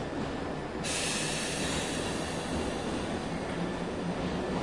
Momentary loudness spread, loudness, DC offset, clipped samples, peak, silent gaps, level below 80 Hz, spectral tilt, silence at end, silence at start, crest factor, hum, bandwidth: 5 LU; -33 LUFS; 0.2%; under 0.1%; -18 dBFS; none; -48 dBFS; -4 dB/octave; 0 s; 0 s; 14 dB; none; 11.5 kHz